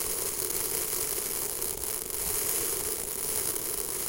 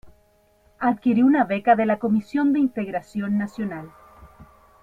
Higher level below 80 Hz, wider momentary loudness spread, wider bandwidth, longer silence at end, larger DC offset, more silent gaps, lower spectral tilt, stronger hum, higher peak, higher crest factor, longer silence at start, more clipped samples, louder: first, -52 dBFS vs -58 dBFS; second, 3 LU vs 11 LU; first, 17.5 kHz vs 7.8 kHz; second, 0 s vs 0.4 s; neither; neither; second, -1 dB/octave vs -8 dB/octave; neither; second, -10 dBFS vs -4 dBFS; about the same, 22 dB vs 18 dB; about the same, 0 s vs 0.05 s; neither; second, -28 LUFS vs -22 LUFS